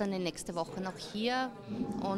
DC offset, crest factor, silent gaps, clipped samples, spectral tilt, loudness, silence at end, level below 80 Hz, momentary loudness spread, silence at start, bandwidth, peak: under 0.1%; 16 dB; none; under 0.1%; -5 dB/octave; -36 LUFS; 0 s; -62 dBFS; 6 LU; 0 s; 14.5 kHz; -20 dBFS